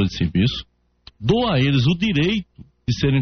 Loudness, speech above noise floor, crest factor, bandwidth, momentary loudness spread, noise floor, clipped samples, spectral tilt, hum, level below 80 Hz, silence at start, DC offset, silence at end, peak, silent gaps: -20 LUFS; 31 dB; 14 dB; 6.6 kHz; 9 LU; -50 dBFS; under 0.1%; -5.5 dB/octave; none; -40 dBFS; 0 s; under 0.1%; 0 s; -6 dBFS; none